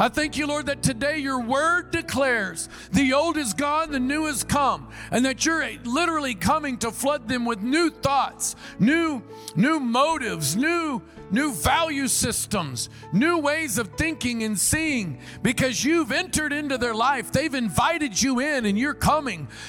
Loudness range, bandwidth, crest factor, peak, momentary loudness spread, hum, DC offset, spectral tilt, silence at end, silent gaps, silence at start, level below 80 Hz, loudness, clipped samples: 1 LU; 17.5 kHz; 18 dB; -6 dBFS; 6 LU; none; under 0.1%; -3.5 dB/octave; 0 s; none; 0 s; -48 dBFS; -23 LUFS; under 0.1%